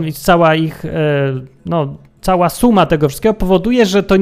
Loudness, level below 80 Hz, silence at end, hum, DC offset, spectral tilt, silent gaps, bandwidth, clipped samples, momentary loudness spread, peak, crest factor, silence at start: -14 LUFS; -32 dBFS; 0 s; none; under 0.1%; -6 dB/octave; none; 16 kHz; under 0.1%; 9 LU; 0 dBFS; 14 dB; 0 s